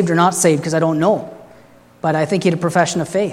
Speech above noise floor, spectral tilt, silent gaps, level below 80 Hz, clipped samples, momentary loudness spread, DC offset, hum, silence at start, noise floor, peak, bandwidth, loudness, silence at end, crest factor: 30 dB; -5 dB/octave; none; -60 dBFS; under 0.1%; 7 LU; under 0.1%; 60 Hz at -50 dBFS; 0 s; -46 dBFS; 0 dBFS; 15 kHz; -16 LUFS; 0 s; 16 dB